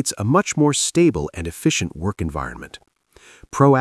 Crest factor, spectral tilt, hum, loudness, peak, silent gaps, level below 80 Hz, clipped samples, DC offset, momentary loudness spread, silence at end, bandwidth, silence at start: 20 dB; -5 dB/octave; none; -20 LUFS; 0 dBFS; none; -44 dBFS; under 0.1%; under 0.1%; 15 LU; 0 s; 12 kHz; 0 s